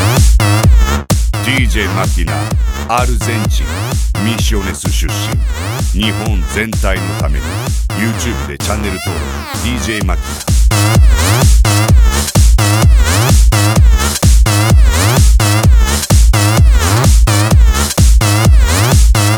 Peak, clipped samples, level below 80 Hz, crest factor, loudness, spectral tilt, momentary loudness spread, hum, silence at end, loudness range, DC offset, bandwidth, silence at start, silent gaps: 0 dBFS; under 0.1%; -12 dBFS; 10 dB; -12 LUFS; -4.5 dB/octave; 7 LU; none; 0 s; 6 LU; under 0.1%; over 20 kHz; 0 s; none